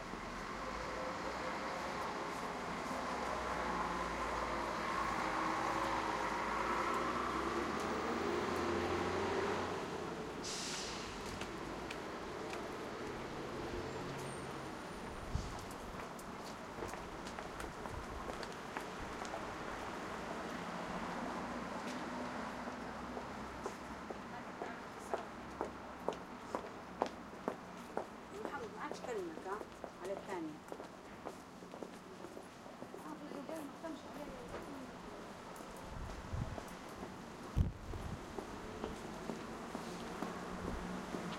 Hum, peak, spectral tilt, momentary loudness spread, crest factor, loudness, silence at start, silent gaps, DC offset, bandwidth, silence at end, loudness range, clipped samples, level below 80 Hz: none; -16 dBFS; -4.5 dB/octave; 12 LU; 26 dB; -43 LUFS; 0 s; none; under 0.1%; 16 kHz; 0 s; 10 LU; under 0.1%; -56 dBFS